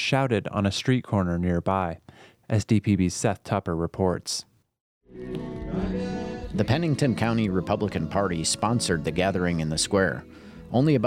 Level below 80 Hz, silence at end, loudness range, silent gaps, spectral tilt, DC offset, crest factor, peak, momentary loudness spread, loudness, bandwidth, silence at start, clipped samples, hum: -46 dBFS; 0 s; 5 LU; 4.81-5.01 s; -5.5 dB/octave; under 0.1%; 18 dB; -8 dBFS; 9 LU; -26 LUFS; 15.5 kHz; 0 s; under 0.1%; none